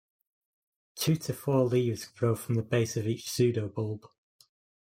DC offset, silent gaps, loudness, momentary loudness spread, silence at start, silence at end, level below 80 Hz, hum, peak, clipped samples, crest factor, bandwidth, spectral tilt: under 0.1%; none; -30 LUFS; 8 LU; 0.95 s; 0.85 s; -68 dBFS; none; -12 dBFS; under 0.1%; 18 dB; 16.5 kHz; -6 dB/octave